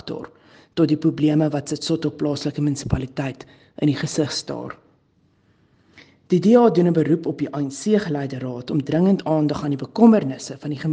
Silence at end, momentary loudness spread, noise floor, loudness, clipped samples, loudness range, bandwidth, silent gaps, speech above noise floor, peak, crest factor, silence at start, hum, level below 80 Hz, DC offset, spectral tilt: 0 s; 15 LU; -61 dBFS; -21 LUFS; under 0.1%; 7 LU; 9.6 kHz; none; 41 dB; 0 dBFS; 20 dB; 0.05 s; none; -48 dBFS; under 0.1%; -6.5 dB/octave